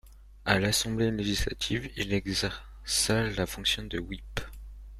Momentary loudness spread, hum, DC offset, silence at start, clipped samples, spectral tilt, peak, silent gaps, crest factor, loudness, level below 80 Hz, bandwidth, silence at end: 13 LU; none; under 0.1%; 0.05 s; under 0.1%; -3.5 dB/octave; -4 dBFS; none; 26 dB; -29 LUFS; -42 dBFS; 15.5 kHz; 0 s